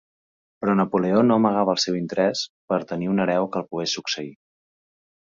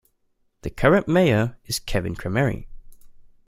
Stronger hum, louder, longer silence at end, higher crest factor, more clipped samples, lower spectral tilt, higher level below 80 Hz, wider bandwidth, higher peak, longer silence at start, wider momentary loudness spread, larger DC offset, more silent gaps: neither; about the same, -22 LUFS vs -22 LUFS; first, 0.9 s vs 0.25 s; about the same, 18 dB vs 20 dB; neither; about the same, -5 dB/octave vs -6 dB/octave; second, -64 dBFS vs -40 dBFS; second, 7.6 kHz vs 16 kHz; about the same, -4 dBFS vs -2 dBFS; about the same, 0.6 s vs 0.65 s; second, 10 LU vs 17 LU; neither; first, 2.49-2.68 s vs none